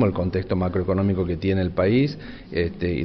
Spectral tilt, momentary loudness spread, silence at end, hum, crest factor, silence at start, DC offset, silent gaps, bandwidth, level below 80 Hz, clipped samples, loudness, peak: -9.5 dB/octave; 6 LU; 0 s; none; 14 dB; 0 s; under 0.1%; none; 6 kHz; -42 dBFS; under 0.1%; -23 LUFS; -8 dBFS